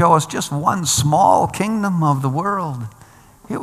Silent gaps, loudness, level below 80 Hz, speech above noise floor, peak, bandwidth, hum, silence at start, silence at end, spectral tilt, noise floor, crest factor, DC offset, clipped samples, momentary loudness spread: none; -17 LUFS; -50 dBFS; 28 dB; 0 dBFS; 15 kHz; none; 0 s; 0 s; -5 dB/octave; -45 dBFS; 18 dB; under 0.1%; under 0.1%; 13 LU